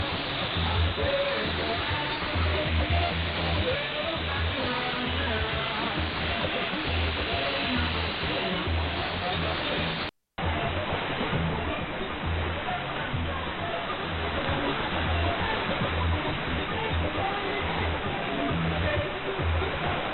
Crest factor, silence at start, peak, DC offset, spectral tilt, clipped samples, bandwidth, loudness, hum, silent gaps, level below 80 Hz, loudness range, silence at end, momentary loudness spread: 16 dB; 0 s; -12 dBFS; under 0.1%; -8.5 dB/octave; under 0.1%; 5.2 kHz; -28 LUFS; none; none; -38 dBFS; 3 LU; 0 s; 4 LU